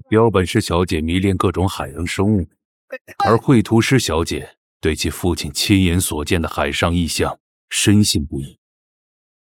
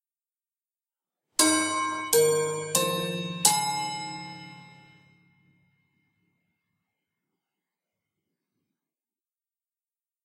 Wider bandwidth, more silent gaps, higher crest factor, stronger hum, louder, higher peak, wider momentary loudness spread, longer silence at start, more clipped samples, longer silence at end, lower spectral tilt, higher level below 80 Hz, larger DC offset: first, 18 kHz vs 16 kHz; first, 2.65-2.88 s, 3.01-3.05 s, 4.57-4.80 s, 7.40-7.68 s vs none; second, 18 dB vs 30 dB; neither; first, -18 LUFS vs -25 LUFS; about the same, 0 dBFS vs 0 dBFS; second, 13 LU vs 16 LU; second, 0.1 s vs 1.4 s; neither; second, 1 s vs 5.55 s; first, -5 dB/octave vs -2 dB/octave; first, -36 dBFS vs -76 dBFS; neither